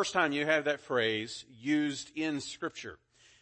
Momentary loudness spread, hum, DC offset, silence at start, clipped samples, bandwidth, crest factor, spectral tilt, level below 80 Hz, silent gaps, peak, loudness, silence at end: 11 LU; none; under 0.1%; 0 s; under 0.1%; 8.8 kHz; 20 dB; -3.5 dB/octave; -72 dBFS; none; -12 dBFS; -32 LUFS; 0.45 s